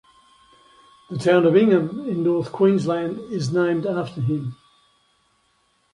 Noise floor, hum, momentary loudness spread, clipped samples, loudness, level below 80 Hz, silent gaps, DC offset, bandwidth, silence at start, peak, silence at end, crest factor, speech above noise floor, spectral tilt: -65 dBFS; none; 12 LU; under 0.1%; -21 LUFS; -62 dBFS; none; under 0.1%; 11 kHz; 1.1 s; -4 dBFS; 1.4 s; 18 dB; 45 dB; -7.5 dB/octave